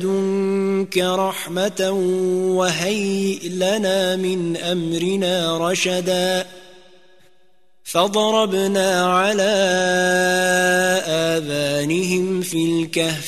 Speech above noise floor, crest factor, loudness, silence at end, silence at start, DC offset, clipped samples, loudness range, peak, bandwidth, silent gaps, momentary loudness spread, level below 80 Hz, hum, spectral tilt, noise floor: 44 dB; 16 dB; -19 LUFS; 0 s; 0 s; 0.4%; under 0.1%; 4 LU; -2 dBFS; 14 kHz; none; 5 LU; -62 dBFS; none; -4 dB/octave; -63 dBFS